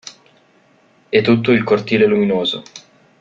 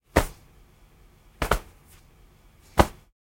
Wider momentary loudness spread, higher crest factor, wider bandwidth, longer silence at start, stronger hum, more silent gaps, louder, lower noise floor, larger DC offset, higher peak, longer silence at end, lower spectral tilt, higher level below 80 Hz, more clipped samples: about the same, 9 LU vs 9 LU; second, 16 dB vs 30 dB; second, 7.6 kHz vs 16.5 kHz; about the same, 0.05 s vs 0.15 s; neither; neither; first, -15 LUFS vs -27 LUFS; about the same, -54 dBFS vs -55 dBFS; neither; about the same, -2 dBFS vs 0 dBFS; about the same, 0.4 s vs 0.35 s; about the same, -6 dB/octave vs -5 dB/octave; second, -56 dBFS vs -36 dBFS; neither